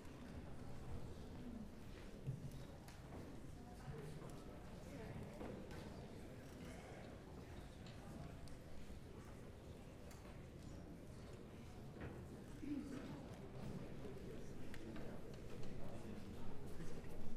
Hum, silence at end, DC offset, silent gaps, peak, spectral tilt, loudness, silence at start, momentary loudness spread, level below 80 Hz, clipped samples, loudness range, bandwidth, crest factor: none; 0 s; under 0.1%; none; -30 dBFS; -6.5 dB/octave; -55 LUFS; 0 s; 5 LU; -58 dBFS; under 0.1%; 4 LU; 14.5 kHz; 18 dB